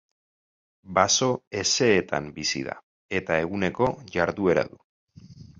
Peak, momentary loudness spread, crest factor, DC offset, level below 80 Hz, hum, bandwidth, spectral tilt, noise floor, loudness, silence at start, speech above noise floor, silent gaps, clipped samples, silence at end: -4 dBFS; 10 LU; 22 dB; under 0.1%; -54 dBFS; none; 8.2 kHz; -3.5 dB/octave; -47 dBFS; -24 LUFS; 0.85 s; 23 dB; 1.47-1.51 s, 2.83-3.09 s, 4.84-5.07 s; under 0.1%; 0.15 s